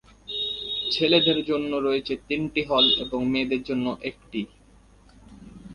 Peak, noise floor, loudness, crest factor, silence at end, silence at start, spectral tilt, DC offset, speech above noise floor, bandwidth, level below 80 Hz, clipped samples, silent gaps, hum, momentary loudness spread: -6 dBFS; -54 dBFS; -24 LUFS; 20 dB; 0 s; 0.3 s; -5.5 dB/octave; under 0.1%; 30 dB; 11 kHz; -54 dBFS; under 0.1%; none; none; 15 LU